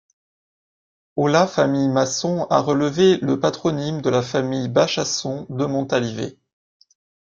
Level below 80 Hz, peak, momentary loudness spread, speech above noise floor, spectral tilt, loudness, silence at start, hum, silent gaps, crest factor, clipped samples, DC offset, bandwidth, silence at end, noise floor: -60 dBFS; -2 dBFS; 8 LU; over 70 dB; -5 dB/octave; -20 LUFS; 1.15 s; none; none; 18 dB; under 0.1%; under 0.1%; 7.6 kHz; 1 s; under -90 dBFS